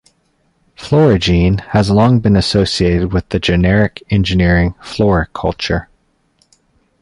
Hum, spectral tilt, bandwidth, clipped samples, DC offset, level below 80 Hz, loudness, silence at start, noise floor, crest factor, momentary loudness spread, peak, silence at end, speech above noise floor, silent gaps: none; -6.5 dB/octave; 11 kHz; under 0.1%; under 0.1%; -28 dBFS; -13 LUFS; 0.8 s; -60 dBFS; 12 dB; 8 LU; -2 dBFS; 1.2 s; 47 dB; none